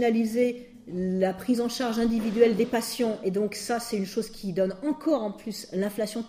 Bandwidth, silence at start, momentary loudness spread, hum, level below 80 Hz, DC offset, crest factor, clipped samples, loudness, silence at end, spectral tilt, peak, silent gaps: 15.5 kHz; 0 s; 10 LU; none; -56 dBFS; under 0.1%; 20 dB; under 0.1%; -27 LUFS; 0 s; -5.5 dB/octave; -8 dBFS; none